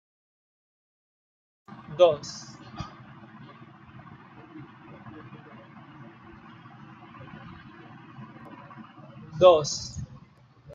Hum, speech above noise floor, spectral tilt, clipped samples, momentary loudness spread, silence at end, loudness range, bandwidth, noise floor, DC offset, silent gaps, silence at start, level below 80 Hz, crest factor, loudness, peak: none; 34 dB; -4.5 dB/octave; under 0.1%; 27 LU; 0.7 s; 20 LU; 7.6 kHz; -55 dBFS; under 0.1%; none; 1.9 s; -62 dBFS; 26 dB; -23 LUFS; -4 dBFS